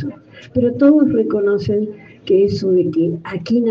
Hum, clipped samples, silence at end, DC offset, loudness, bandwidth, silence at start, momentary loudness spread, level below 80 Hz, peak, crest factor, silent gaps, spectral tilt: none; under 0.1%; 0 s; under 0.1%; -16 LUFS; 7 kHz; 0 s; 13 LU; -50 dBFS; -2 dBFS; 14 dB; none; -8.5 dB/octave